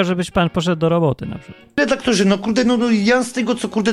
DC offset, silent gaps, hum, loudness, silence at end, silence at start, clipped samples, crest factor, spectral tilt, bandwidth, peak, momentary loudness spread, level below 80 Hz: under 0.1%; none; none; -17 LUFS; 0 s; 0 s; under 0.1%; 16 dB; -5.5 dB/octave; 12.5 kHz; -2 dBFS; 8 LU; -44 dBFS